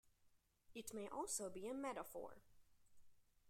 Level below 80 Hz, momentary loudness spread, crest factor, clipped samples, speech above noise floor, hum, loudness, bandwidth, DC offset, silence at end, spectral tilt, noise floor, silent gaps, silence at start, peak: -78 dBFS; 11 LU; 22 dB; under 0.1%; 28 dB; none; -49 LUFS; 16 kHz; under 0.1%; 0 s; -3 dB/octave; -77 dBFS; none; 0.05 s; -32 dBFS